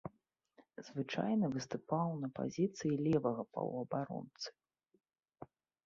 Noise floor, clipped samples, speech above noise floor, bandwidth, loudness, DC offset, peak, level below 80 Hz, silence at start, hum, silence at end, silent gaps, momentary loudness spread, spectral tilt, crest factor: -76 dBFS; under 0.1%; 38 dB; 7.4 kHz; -38 LUFS; under 0.1%; -20 dBFS; -74 dBFS; 0.05 s; none; 0.4 s; none; 22 LU; -6.5 dB/octave; 20 dB